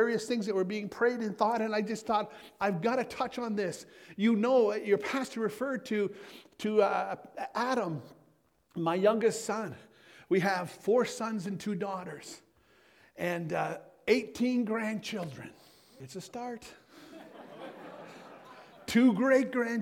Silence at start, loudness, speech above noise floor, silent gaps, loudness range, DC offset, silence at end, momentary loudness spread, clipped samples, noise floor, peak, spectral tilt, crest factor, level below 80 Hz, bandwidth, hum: 0 s; -31 LUFS; 38 dB; none; 6 LU; under 0.1%; 0 s; 21 LU; under 0.1%; -68 dBFS; -12 dBFS; -5.5 dB/octave; 20 dB; -72 dBFS; 16.5 kHz; none